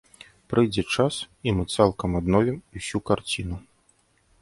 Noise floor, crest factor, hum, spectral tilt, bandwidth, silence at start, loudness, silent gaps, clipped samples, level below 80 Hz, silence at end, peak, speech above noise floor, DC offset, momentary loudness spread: -64 dBFS; 22 dB; none; -5.5 dB/octave; 11.5 kHz; 0.5 s; -25 LUFS; none; under 0.1%; -44 dBFS; 0.8 s; -4 dBFS; 40 dB; under 0.1%; 9 LU